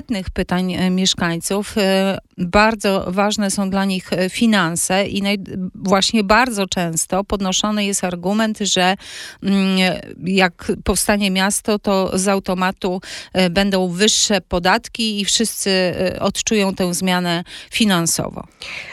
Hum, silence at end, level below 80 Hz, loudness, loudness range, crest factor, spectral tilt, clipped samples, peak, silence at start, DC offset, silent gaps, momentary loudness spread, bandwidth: none; 0 s; -40 dBFS; -18 LUFS; 2 LU; 18 dB; -3.5 dB/octave; under 0.1%; 0 dBFS; 0.1 s; under 0.1%; none; 8 LU; 15.5 kHz